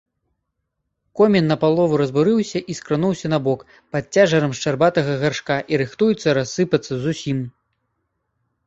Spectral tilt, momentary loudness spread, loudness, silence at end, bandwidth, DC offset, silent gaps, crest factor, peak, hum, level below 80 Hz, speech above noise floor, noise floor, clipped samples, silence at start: -6 dB/octave; 10 LU; -19 LUFS; 1.15 s; 8 kHz; under 0.1%; none; 18 dB; -2 dBFS; none; -56 dBFS; 57 dB; -76 dBFS; under 0.1%; 1.15 s